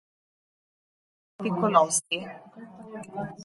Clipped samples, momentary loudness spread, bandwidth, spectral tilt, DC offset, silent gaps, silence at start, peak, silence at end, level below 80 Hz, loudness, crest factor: under 0.1%; 23 LU; 11.5 kHz; -3.5 dB/octave; under 0.1%; none; 1.4 s; -6 dBFS; 0 s; -70 dBFS; -26 LUFS; 24 dB